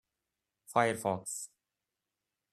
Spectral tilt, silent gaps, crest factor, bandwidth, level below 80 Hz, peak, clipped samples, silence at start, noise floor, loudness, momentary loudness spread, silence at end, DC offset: -4 dB/octave; none; 24 dB; 14 kHz; -78 dBFS; -12 dBFS; under 0.1%; 0.7 s; -89 dBFS; -33 LUFS; 12 LU; 1.05 s; under 0.1%